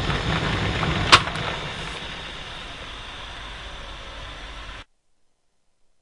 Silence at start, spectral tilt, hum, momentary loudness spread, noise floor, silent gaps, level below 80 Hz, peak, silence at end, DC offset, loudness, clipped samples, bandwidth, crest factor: 0 s; -3.5 dB/octave; none; 21 LU; -65 dBFS; none; -38 dBFS; 0 dBFS; 1.2 s; under 0.1%; -22 LUFS; under 0.1%; 12 kHz; 26 dB